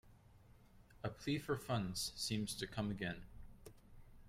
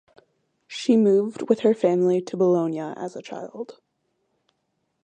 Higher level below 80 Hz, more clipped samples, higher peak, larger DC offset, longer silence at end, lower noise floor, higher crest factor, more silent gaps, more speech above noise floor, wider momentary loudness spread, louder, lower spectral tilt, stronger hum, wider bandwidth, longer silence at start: first, -62 dBFS vs -76 dBFS; neither; second, -26 dBFS vs -4 dBFS; neither; second, 0 s vs 1.3 s; second, -64 dBFS vs -75 dBFS; about the same, 18 dB vs 20 dB; neither; second, 22 dB vs 53 dB; first, 21 LU vs 17 LU; second, -42 LUFS vs -22 LUFS; second, -4.5 dB/octave vs -7 dB/octave; neither; first, 16 kHz vs 9.2 kHz; second, 0.05 s vs 0.7 s